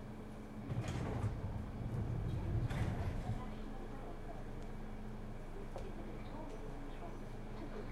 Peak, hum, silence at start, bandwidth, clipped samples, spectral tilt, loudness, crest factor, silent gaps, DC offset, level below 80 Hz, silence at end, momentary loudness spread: -28 dBFS; none; 0 s; 13 kHz; under 0.1%; -7.5 dB/octave; -45 LUFS; 14 dB; none; under 0.1%; -46 dBFS; 0 s; 10 LU